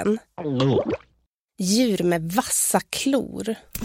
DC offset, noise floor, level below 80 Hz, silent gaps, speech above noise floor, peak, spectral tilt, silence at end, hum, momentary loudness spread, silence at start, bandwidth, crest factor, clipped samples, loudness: under 0.1%; -68 dBFS; -52 dBFS; 1.27-1.48 s; 45 dB; -4 dBFS; -4 dB/octave; 0 s; none; 10 LU; 0 s; 16.5 kHz; 20 dB; under 0.1%; -23 LUFS